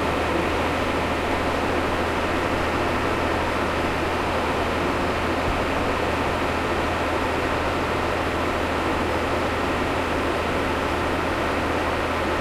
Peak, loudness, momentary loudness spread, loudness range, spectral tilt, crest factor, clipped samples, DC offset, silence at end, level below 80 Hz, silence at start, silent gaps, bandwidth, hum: -8 dBFS; -23 LUFS; 1 LU; 0 LU; -5 dB/octave; 14 dB; under 0.1%; under 0.1%; 0 s; -38 dBFS; 0 s; none; 16 kHz; none